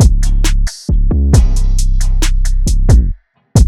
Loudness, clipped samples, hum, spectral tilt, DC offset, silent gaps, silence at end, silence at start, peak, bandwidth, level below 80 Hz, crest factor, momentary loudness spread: -14 LUFS; under 0.1%; none; -5.5 dB/octave; under 0.1%; none; 0 s; 0 s; 0 dBFS; 12.5 kHz; -10 dBFS; 8 dB; 6 LU